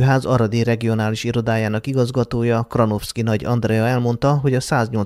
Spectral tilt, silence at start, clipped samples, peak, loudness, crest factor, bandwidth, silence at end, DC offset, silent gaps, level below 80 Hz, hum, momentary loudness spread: -7 dB/octave; 0 s; under 0.1%; -2 dBFS; -19 LUFS; 16 dB; 14.5 kHz; 0 s; under 0.1%; none; -44 dBFS; none; 3 LU